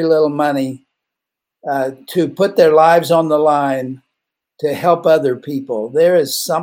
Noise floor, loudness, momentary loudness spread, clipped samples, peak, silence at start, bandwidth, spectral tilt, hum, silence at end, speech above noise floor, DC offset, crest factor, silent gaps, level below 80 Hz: -82 dBFS; -15 LUFS; 12 LU; under 0.1%; 0 dBFS; 0 s; 17 kHz; -5 dB/octave; none; 0 s; 68 dB; under 0.1%; 14 dB; none; -66 dBFS